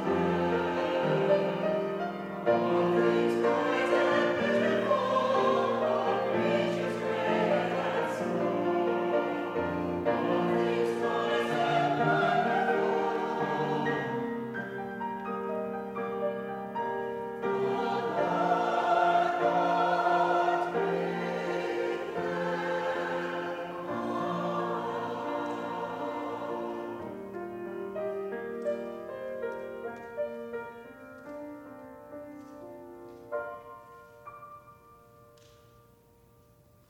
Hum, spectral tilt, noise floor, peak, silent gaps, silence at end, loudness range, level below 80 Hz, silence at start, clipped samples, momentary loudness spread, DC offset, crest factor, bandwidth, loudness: none; -6.5 dB/octave; -60 dBFS; -12 dBFS; none; 1.95 s; 15 LU; -68 dBFS; 0 s; under 0.1%; 14 LU; under 0.1%; 18 dB; 15.5 kHz; -30 LUFS